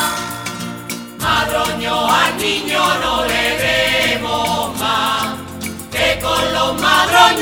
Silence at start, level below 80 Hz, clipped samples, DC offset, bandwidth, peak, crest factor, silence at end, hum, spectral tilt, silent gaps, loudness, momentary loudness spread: 0 s; -40 dBFS; under 0.1%; under 0.1%; over 20 kHz; 0 dBFS; 16 dB; 0 s; none; -2.5 dB/octave; none; -15 LUFS; 12 LU